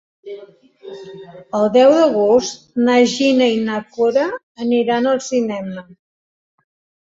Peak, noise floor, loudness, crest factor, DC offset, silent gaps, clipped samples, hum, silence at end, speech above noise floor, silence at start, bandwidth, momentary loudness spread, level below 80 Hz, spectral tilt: -2 dBFS; under -90 dBFS; -16 LUFS; 16 dB; under 0.1%; 4.43-4.55 s; under 0.1%; none; 1.2 s; over 74 dB; 0.25 s; 7.8 kHz; 23 LU; -62 dBFS; -4.5 dB/octave